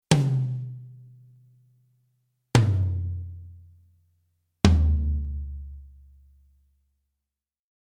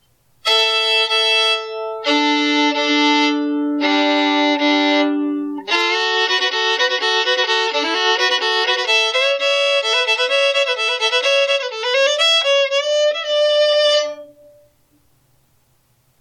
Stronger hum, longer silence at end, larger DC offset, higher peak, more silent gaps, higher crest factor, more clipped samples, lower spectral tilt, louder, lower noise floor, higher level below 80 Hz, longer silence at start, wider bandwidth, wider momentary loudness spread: neither; about the same, 2 s vs 1.95 s; neither; first, -2 dBFS vs -6 dBFS; neither; first, 26 dB vs 12 dB; neither; first, -6 dB/octave vs 0 dB/octave; second, -25 LUFS vs -15 LUFS; first, -89 dBFS vs -60 dBFS; first, -34 dBFS vs -74 dBFS; second, 0.1 s vs 0.45 s; about the same, 12.5 kHz vs 12.5 kHz; first, 23 LU vs 5 LU